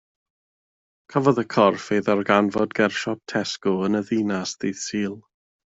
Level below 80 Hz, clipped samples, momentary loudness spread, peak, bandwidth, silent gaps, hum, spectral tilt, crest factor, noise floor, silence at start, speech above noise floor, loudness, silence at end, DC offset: -64 dBFS; under 0.1%; 8 LU; -4 dBFS; 8 kHz; none; none; -5 dB/octave; 20 dB; under -90 dBFS; 1.1 s; over 68 dB; -23 LUFS; 0.55 s; under 0.1%